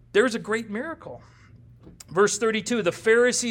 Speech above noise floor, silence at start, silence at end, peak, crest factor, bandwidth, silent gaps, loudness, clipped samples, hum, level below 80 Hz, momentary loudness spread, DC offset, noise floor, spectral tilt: 26 dB; 0.15 s; 0 s; -6 dBFS; 18 dB; 17 kHz; none; -23 LUFS; under 0.1%; none; -60 dBFS; 14 LU; under 0.1%; -49 dBFS; -3 dB/octave